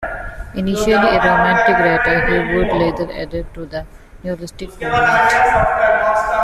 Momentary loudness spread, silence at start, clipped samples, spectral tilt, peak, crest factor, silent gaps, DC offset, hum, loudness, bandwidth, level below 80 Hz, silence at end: 16 LU; 0 s; under 0.1%; -5.5 dB/octave; -2 dBFS; 14 dB; none; under 0.1%; none; -14 LUFS; 14 kHz; -32 dBFS; 0 s